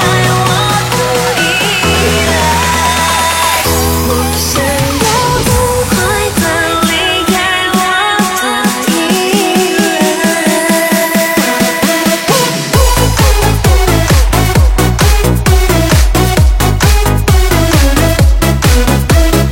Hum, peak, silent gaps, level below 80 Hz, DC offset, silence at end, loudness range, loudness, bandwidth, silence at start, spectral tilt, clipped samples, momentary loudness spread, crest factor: none; 0 dBFS; none; -16 dBFS; under 0.1%; 0 s; 1 LU; -10 LUFS; 17 kHz; 0 s; -4 dB/octave; under 0.1%; 2 LU; 10 dB